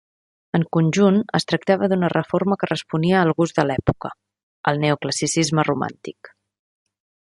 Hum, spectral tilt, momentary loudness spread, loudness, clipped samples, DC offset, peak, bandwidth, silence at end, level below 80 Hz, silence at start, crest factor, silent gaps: none; -5.5 dB/octave; 8 LU; -20 LUFS; under 0.1%; under 0.1%; -2 dBFS; 11.5 kHz; 1.05 s; -52 dBFS; 0.55 s; 18 dB; 4.43-4.64 s